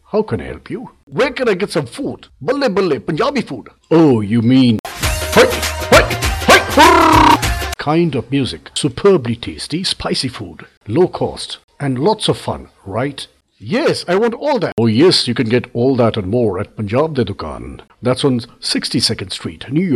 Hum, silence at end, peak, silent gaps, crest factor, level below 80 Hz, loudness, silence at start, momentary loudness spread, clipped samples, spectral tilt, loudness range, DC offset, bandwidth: none; 0 s; 0 dBFS; 1.03-1.07 s, 4.79-4.84 s, 10.77-10.81 s, 11.64-11.68 s, 14.72-14.77 s; 16 dB; -32 dBFS; -15 LUFS; 0.15 s; 15 LU; under 0.1%; -5 dB/octave; 8 LU; under 0.1%; 16.5 kHz